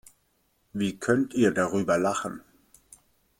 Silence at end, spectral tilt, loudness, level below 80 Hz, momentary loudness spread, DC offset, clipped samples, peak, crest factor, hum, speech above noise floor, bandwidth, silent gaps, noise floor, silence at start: 1 s; -5.5 dB/octave; -26 LUFS; -64 dBFS; 14 LU; under 0.1%; under 0.1%; -8 dBFS; 20 dB; none; 45 dB; 16.5 kHz; none; -70 dBFS; 0.75 s